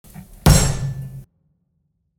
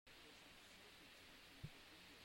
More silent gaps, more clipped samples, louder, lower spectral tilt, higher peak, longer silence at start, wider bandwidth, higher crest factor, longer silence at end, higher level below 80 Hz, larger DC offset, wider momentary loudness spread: neither; neither; first, -18 LUFS vs -61 LUFS; about the same, -4.5 dB/octave vs -3.5 dB/octave; first, 0 dBFS vs -42 dBFS; about the same, 0.15 s vs 0.05 s; first, 18.5 kHz vs 16 kHz; about the same, 20 dB vs 20 dB; first, 0.95 s vs 0 s; first, -28 dBFS vs -76 dBFS; neither; first, 21 LU vs 3 LU